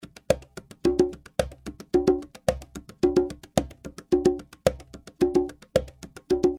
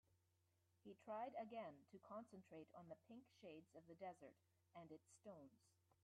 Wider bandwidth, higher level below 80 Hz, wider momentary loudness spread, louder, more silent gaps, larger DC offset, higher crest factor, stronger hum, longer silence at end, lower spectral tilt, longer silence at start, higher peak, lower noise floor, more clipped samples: first, 15.5 kHz vs 10.5 kHz; first, -44 dBFS vs under -90 dBFS; first, 19 LU vs 14 LU; first, -26 LUFS vs -60 LUFS; neither; neither; first, 24 dB vs 18 dB; neither; second, 0 s vs 0.3 s; about the same, -6 dB/octave vs -6 dB/octave; first, 0.3 s vs 0.1 s; first, -4 dBFS vs -42 dBFS; second, -45 dBFS vs -85 dBFS; neither